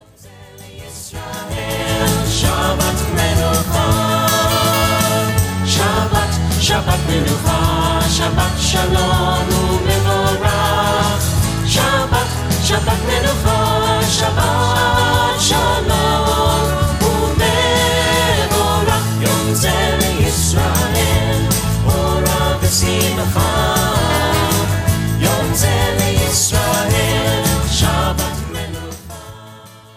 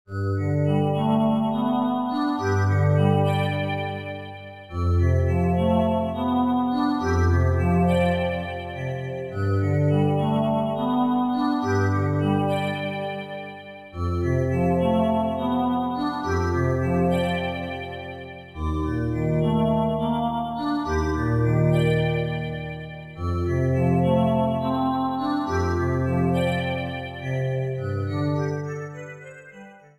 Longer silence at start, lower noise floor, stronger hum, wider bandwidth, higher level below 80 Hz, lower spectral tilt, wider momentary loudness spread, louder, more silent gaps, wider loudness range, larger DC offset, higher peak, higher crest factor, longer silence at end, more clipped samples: first, 0.25 s vs 0.1 s; second, -40 dBFS vs -45 dBFS; neither; first, 16.5 kHz vs 12.5 kHz; first, -24 dBFS vs -40 dBFS; second, -4 dB/octave vs -8 dB/octave; second, 4 LU vs 11 LU; first, -15 LUFS vs -24 LUFS; neither; about the same, 1 LU vs 3 LU; neither; first, -2 dBFS vs -8 dBFS; about the same, 14 dB vs 16 dB; about the same, 0.15 s vs 0.2 s; neither